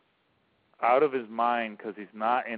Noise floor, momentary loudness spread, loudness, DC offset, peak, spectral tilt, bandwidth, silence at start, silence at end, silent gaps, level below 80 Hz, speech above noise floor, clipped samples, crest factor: -70 dBFS; 14 LU; -27 LUFS; under 0.1%; -10 dBFS; -2.5 dB/octave; 4.8 kHz; 0.8 s; 0 s; none; -82 dBFS; 43 dB; under 0.1%; 18 dB